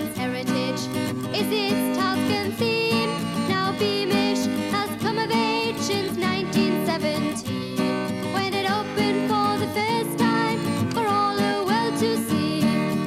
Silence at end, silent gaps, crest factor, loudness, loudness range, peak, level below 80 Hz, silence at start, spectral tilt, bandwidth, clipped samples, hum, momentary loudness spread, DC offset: 0 s; none; 12 dB; -23 LUFS; 2 LU; -10 dBFS; -58 dBFS; 0 s; -5 dB/octave; 16 kHz; under 0.1%; none; 4 LU; under 0.1%